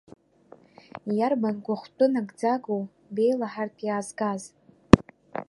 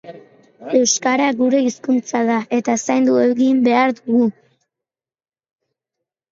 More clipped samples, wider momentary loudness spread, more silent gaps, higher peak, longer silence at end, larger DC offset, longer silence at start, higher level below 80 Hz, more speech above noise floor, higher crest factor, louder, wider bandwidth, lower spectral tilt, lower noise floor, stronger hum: neither; first, 16 LU vs 5 LU; neither; about the same, 0 dBFS vs -2 dBFS; second, 0.05 s vs 2 s; neither; first, 1.05 s vs 0.05 s; first, -44 dBFS vs -68 dBFS; second, 28 dB vs over 74 dB; first, 26 dB vs 16 dB; second, -26 LUFS vs -17 LUFS; first, 11.5 kHz vs 7.8 kHz; first, -7 dB/octave vs -3.5 dB/octave; second, -54 dBFS vs under -90 dBFS; neither